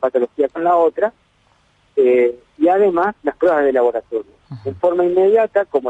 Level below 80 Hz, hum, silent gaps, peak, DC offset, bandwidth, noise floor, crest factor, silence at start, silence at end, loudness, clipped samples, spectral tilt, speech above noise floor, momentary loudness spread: -58 dBFS; none; none; -4 dBFS; under 0.1%; 7.8 kHz; -57 dBFS; 12 dB; 0 s; 0 s; -16 LUFS; under 0.1%; -8 dB/octave; 42 dB; 11 LU